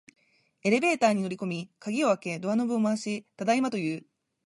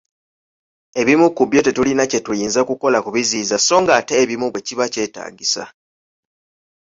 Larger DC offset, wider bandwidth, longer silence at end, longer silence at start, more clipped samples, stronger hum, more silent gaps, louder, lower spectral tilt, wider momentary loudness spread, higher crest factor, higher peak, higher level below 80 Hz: neither; first, 11.5 kHz vs 7.8 kHz; second, 0.45 s vs 1.15 s; second, 0.65 s vs 0.95 s; neither; neither; neither; second, -28 LUFS vs -17 LUFS; first, -5.5 dB/octave vs -3 dB/octave; about the same, 10 LU vs 9 LU; about the same, 18 dB vs 16 dB; second, -10 dBFS vs -2 dBFS; second, -78 dBFS vs -56 dBFS